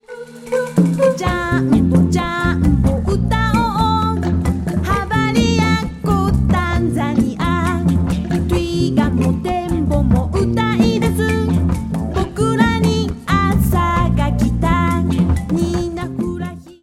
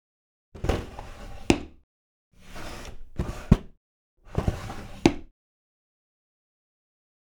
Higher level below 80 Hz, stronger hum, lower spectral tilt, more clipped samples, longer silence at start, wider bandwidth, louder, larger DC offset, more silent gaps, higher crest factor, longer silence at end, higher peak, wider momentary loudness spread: first, -26 dBFS vs -38 dBFS; neither; about the same, -7 dB/octave vs -6 dB/octave; neither; second, 0.1 s vs 0.55 s; second, 15.5 kHz vs 19.5 kHz; first, -17 LUFS vs -28 LUFS; neither; second, none vs 1.83-2.31 s, 3.77-4.17 s; second, 16 dB vs 30 dB; second, 0.1 s vs 2.05 s; about the same, 0 dBFS vs 0 dBFS; second, 5 LU vs 18 LU